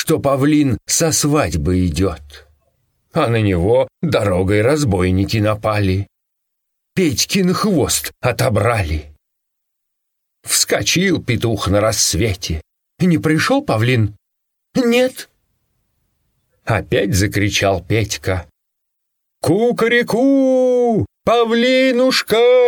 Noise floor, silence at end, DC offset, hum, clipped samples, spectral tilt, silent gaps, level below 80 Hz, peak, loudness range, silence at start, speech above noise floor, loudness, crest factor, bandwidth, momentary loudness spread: -74 dBFS; 0 s; under 0.1%; none; under 0.1%; -4.5 dB/octave; none; -38 dBFS; -2 dBFS; 3 LU; 0 s; 59 dB; -16 LUFS; 16 dB; 19 kHz; 8 LU